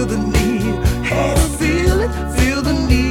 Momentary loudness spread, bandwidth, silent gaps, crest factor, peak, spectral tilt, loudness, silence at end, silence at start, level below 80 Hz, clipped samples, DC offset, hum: 3 LU; 17 kHz; none; 14 dB; -2 dBFS; -5.5 dB/octave; -17 LUFS; 0 s; 0 s; -20 dBFS; under 0.1%; under 0.1%; none